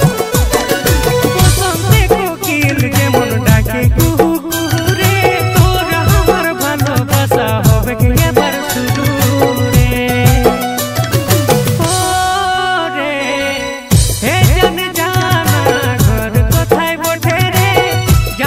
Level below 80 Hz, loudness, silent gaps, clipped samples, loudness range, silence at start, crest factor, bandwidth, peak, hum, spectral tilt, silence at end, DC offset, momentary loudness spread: -22 dBFS; -12 LUFS; none; under 0.1%; 1 LU; 0 s; 12 dB; 16.5 kHz; 0 dBFS; none; -5 dB/octave; 0 s; under 0.1%; 4 LU